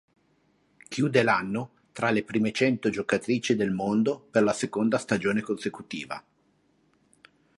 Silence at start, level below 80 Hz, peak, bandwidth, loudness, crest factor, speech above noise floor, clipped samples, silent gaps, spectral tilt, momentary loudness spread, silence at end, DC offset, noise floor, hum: 0.9 s; -66 dBFS; -6 dBFS; 11.5 kHz; -27 LUFS; 22 dB; 41 dB; under 0.1%; none; -5.5 dB/octave; 11 LU; 1.4 s; under 0.1%; -67 dBFS; 50 Hz at -55 dBFS